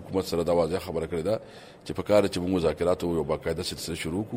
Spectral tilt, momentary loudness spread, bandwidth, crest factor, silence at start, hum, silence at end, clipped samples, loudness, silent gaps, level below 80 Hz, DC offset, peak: -5.5 dB/octave; 9 LU; 16 kHz; 18 dB; 0 s; none; 0 s; under 0.1%; -27 LUFS; none; -50 dBFS; under 0.1%; -8 dBFS